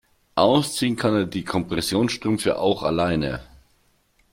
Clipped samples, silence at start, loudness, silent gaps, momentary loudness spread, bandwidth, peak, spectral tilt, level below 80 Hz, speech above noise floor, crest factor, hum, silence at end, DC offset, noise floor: under 0.1%; 0.35 s; -22 LUFS; none; 7 LU; 16.5 kHz; -4 dBFS; -5 dB/octave; -48 dBFS; 41 dB; 20 dB; none; 0.9 s; under 0.1%; -63 dBFS